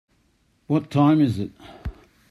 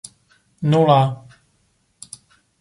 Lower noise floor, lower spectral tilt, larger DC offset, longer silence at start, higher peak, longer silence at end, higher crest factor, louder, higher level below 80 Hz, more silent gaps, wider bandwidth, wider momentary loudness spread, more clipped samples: about the same, -64 dBFS vs -64 dBFS; first, -8.5 dB/octave vs -7 dB/octave; neither; about the same, 0.7 s vs 0.6 s; second, -6 dBFS vs -2 dBFS; second, 0.4 s vs 1.45 s; about the same, 16 dB vs 20 dB; second, -21 LUFS vs -17 LUFS; first, -44 dBFS vs -62 dBFS; neither; about the same, 11 kHz vs 11.5 kHz; second, 20 LU vs 26 LU; neither